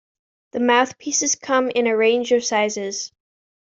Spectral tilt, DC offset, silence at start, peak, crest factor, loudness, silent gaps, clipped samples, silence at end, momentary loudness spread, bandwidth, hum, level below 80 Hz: -1.5 dB/octave; under 0.1%; 0.55 s; -4 dBFS; 18 dB; -19 LUFS; none; under 0.1%; 0.55 s; 10 LU; 7.8 kHz; none; -68 dBFS